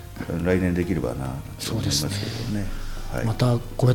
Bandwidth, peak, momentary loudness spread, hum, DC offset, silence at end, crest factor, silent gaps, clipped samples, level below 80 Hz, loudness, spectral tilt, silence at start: 17.5 kHz; -6 dBFS; 9 LU; none; under 0.1%; 0 s; 18 dB; none; under 0.1%; -36 dBFS; -25 LUFS; -5.5 dB/octave; 0 s